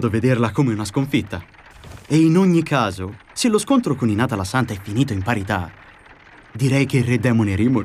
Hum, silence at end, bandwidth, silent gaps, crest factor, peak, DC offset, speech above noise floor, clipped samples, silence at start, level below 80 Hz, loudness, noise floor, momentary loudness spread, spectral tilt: none; 0 s; 15.5 kHz; none; 14 dB; -6 dBFS; under 0.1%; 27 dB; under 0.1%; 0 s; -52 dBFS; -19 LUFS; -46 dBFS; 9 LU; -6.5 dB/octave